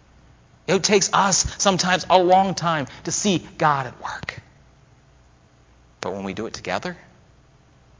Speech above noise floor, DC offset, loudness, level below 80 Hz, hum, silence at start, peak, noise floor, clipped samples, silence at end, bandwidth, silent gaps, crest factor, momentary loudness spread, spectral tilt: 33 dB; under 0.1%; -20 LUFS; -48 dBFS; none; 0.7 s; 0 dBFS; -54 dBFS; under 0.1%; 1.05 s; 7.8 kHz; none; 22 dB; 15 LU; -3 dB/octave